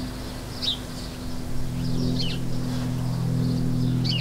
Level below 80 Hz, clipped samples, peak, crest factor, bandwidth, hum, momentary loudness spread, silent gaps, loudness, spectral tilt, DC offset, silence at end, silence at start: -36 dBFS; under 0.1%; -12 dBFS; 14 dB; 16 kHz; none; 9 LU; none; -27 LUFS; -6 dB/octave; under 0.1%; 0 s; 0 s